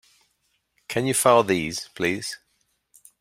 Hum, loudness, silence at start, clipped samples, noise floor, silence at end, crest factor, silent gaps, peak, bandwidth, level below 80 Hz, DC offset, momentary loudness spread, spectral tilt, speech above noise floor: none; -22 LUFS; 0.9 s; under 0.1%; -71 dBFS; 0.85 s; 22 dB; none; -4 dBFS; 16.5 kHz; -60 dBFS; under 0.1%; 14 LU; -3.5 dB/octave; 49 dB